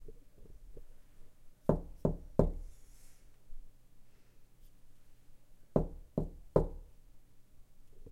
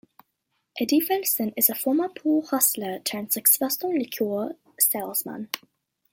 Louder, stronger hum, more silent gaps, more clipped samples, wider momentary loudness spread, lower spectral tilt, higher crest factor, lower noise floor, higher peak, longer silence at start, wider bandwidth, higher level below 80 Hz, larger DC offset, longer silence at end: second, -36 LUFS vs -23 LUFS; neither; neither; neither; first, 25 LU vs 13 LU; first, -10 dB/octave vs -2.5 dB/octave; first, 30 dB vs 22 dB; second, -57 dBFS vs -76 dBFS; second, -10 dBFS vs -4 dBFS; second, 0 s vs 0.75 s; second, 13.5 kHz vs 17 kHz; first, -46 dBFS vs -76 dBFS; neither; second, 0 s vs 0.55 s